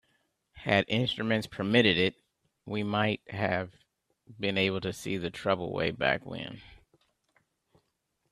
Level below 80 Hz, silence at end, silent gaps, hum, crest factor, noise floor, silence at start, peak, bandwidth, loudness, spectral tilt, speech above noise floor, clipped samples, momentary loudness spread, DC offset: -62 dBFS; 1.55 s; none; none; 24 dB; -79 dBFS; 0.55 s; -8 dBFS; 13.5 kHz; -29 LUFS; -5.5 dB/octave; 49 dB; under 0.1%; 14 LU; under 0.1%